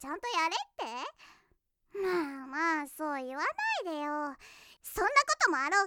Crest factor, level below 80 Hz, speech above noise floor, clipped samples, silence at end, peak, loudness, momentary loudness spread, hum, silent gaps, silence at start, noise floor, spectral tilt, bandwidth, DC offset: 24 dB; -64 dBFS; 41 dB; under 0.1%; 0 s; -10 dBFS; -32 LUFS; 15 LU; none; none; 0 s; -73 dBFS; -1.5 dB/octave; 19.5 kHz; under 0.1%